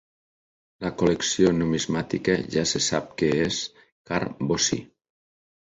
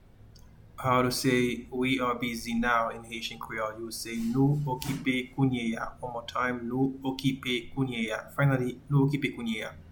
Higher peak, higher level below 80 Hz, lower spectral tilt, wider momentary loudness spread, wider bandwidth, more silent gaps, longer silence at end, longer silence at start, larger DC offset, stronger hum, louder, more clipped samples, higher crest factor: first, -6 dBFS vs -12 dBFS; about the same, -52 dBFS vs -52 dBFS; second, -4 dB/octave vs -5.5 dB/octave; about the same, 9 LU vs 9 LU; second, 8.2 kHz vs 19 kHz; first, 3.92-4.05 s vs none; first, 0.9 s vs 0 s; first, 0.8 s vs 0.25 s; neither; neither; first, -24 LUFS vs -29 LUFS; neither; about the same, 20 dB vs 18 dB